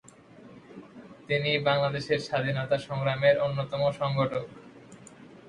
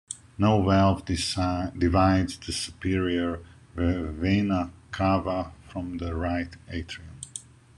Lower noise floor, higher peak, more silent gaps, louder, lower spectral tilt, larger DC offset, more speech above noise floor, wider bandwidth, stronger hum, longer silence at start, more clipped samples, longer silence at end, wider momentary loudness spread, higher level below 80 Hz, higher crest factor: first, -51 dBFS vs -45 dBFS; about the same, -10 dBFS vs -8 dBFS; neither; about the same, -27 LUFS vs -26 LUFS; about the same, -6 dB/octave vs -6 dB/octave; neither; first, 24 dB vs 19 dB; about the same, 11 kHz vs 12 kHz; neither; first, 0.4 s vs 0.1 s; neither; second, 0 s vs 0.35 s; first, 24 LU vs 17 LU; second, -62 dBFS vs -44 dBFS; about the same, 18 dB vs 18 dB